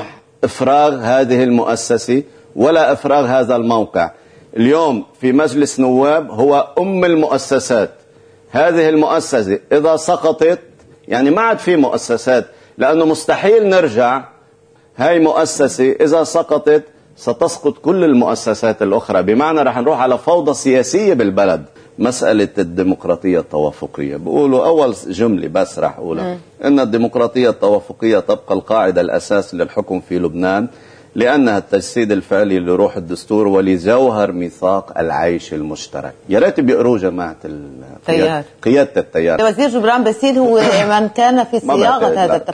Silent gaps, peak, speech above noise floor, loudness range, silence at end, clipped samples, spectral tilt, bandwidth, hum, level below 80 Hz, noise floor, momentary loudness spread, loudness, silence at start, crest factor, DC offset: none; 0 dBFS; 35 dB; 3 LU; 0 s; under 0.1%; -5.5 dB/octave; 10.5 kHz; none; -52 dBFS; -49 dBFS; 8 LU; -14 LUFS; 0 s; 12 dB; under 0.1%